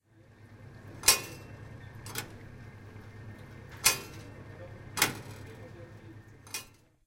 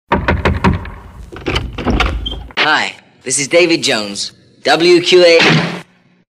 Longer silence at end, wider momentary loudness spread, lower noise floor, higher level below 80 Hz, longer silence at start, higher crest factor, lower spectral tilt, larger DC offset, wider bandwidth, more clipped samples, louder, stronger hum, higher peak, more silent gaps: second, 0.3 s vs 0.5 s; first, 23 LU vs 15 LU; first, -57 dBFS vs -39 dBFS; second, -58 dBFS vs -26 dBFS; about the same, 0.15 s vs 0.1 s; first, 32 dB vs 14 dB; second, -1 dB/octave vs -4 dB/octave; neither; first, 16 kHz vs 13 kHz; neither; second, -29 LUFS vs -12 LUFS; neither; second, -6 dBFS vs 0 dBFS; neither